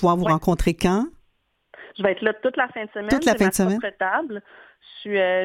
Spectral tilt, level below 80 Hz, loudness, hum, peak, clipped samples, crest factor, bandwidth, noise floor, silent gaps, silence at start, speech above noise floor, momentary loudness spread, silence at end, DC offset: -5.5 dB/octave; -38 dBFS; -22 LUFS; none; -4 dBFS; under 0.1%; 18 dB; 16.5 kHz; -66 dBFS; none; 0 s; 45 dB; 12 LU; 0 s; under 0.1%